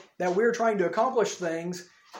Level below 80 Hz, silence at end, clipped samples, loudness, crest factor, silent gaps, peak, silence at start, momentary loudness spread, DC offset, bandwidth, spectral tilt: -78 dBFS; 0 s; under 0.1%; -26 LUFS; 16 dB; none; -12 dBFS; 0.2 s; 10 LU; under 0.1%; 16.5 kHz; -5 dB/octave